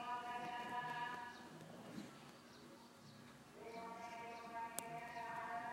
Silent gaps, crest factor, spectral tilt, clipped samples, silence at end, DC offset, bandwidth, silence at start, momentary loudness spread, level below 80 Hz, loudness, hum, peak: none; 30 dB; -3.5 dB/octave; under 0.1%; 0 s; under 0.1%; 16 kHz; 0 s; 14 LU; -82 dBFS; -50 LUFS; none; -20 dBFS